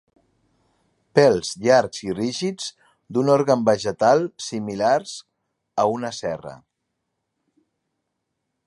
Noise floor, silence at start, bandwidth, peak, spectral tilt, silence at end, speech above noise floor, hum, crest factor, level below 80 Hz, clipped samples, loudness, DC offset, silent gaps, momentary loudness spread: -78 dBFS; 1.15 s; 11.5 kHz; 0 dBFS; -5 dB/octave; 2.1 s; 58 dB; none; 22 dB; -62 dBFS; under 0.1%; -21 LUFS; under 0.1%; none; 14 LU